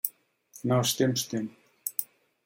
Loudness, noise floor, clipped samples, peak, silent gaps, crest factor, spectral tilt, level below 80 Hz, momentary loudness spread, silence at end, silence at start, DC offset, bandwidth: -29 LUFS; -56 dBFS; under 0.1%; -8 dBFS; none; 24 dB; -4.5 dB/octave; -74 dBFS; 13 LU; 0.4 s; 0.05 s; under 0.1%; 17 kHz